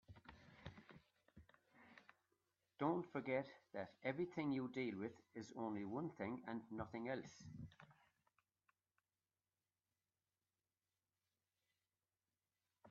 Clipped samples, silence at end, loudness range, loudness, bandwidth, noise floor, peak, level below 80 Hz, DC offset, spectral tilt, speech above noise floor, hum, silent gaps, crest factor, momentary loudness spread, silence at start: under 0.1%; 0 s; 9 LU; -48 LUFS; 7 kHz; under -90 dBFS; -28 dBFS; -82 dBFS; under 0.1%; -6 dB/octave; over 43 dB; none; none; 24 dB; 21 LU; 0.1 s